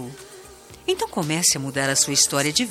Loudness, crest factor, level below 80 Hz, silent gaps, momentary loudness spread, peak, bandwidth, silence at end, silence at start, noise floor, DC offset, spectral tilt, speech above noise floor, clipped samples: -20 LUFS; 20 dB; -56 dBFS; none; 14 LU; -4 dBFS; 17 kHz; 0 s; 0 s; -44 dBFS; under 0.1%; -2 dB/octave; 22 dB; under 0.1%